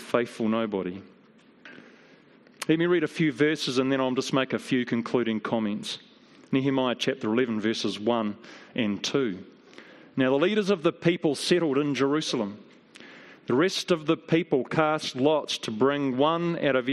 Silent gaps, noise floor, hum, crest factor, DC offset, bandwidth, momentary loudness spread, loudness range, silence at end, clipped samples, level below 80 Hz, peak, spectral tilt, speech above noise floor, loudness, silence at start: none; -55 dBFS; none; 20 dB; under 0.1%; 13 kHz; 10 LU; 3 LU; 0 s; under 0.1%; -72 dBFS; -6 dBFS; -5 dB/octave; 30 dB; -26 LUFS; 0 s